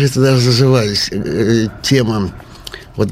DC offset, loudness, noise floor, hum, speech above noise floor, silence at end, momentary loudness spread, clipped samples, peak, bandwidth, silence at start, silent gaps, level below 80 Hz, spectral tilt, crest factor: under 0.1%; -14 LUFS; -33 dBFS; none; 20 dB; 0 s; 18 LU; under 0.1%; 0 dBFS; 15.5 kHz; 0 s; none; -38 dBFS; -5.5 dB/octave; 14 dB